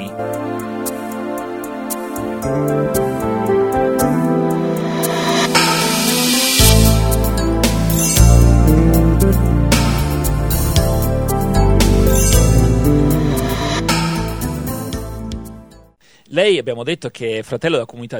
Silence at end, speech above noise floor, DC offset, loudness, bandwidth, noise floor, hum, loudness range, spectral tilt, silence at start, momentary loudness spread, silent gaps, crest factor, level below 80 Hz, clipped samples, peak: 0 s; 30 dB; under 0.1%; -15 LUFS; 18.5 kHz; -49 dBFS; none; 8 LU; -5 dB/octave; 0 s; 12 LU; none; 14 dB; -20 dBFS; under 0.1%; 0 dBFS